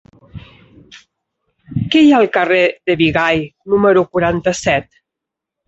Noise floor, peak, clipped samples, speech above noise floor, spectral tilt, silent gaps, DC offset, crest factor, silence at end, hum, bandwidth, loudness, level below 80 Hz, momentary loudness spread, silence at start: -82 dBFS; 0 dBFS; under 0.1%; 69 dB; -5.5 dB/octave; none; under 0.1%; 14 dB; 0.85 s; none; 8.2 kHz; -14 LUFS; -44 dBFS; 9 LU; 0.35 s